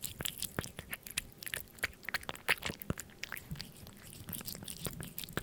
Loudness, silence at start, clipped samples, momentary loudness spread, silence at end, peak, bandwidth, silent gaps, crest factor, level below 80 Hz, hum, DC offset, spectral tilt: -40 LUFS; 0 s; under 0.1%; 12 LU; 0 s; -12 dBFS; 19 kHz; none; 30 dB; -58 dBFS; none; under 0.1%; -2.5 dB/octave